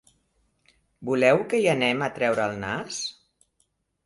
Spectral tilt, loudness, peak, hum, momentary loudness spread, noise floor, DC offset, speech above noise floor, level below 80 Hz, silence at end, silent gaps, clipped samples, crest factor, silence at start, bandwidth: -4.5 dB/octave; -24 LUFS; -4 dBFS; none; 12 LU; -72 dBFS; under 0.1%; 48 dB; -62 dBFS; 0.95 s; none; under 0.1%; 22 dB; 1 s; 11.5 kHz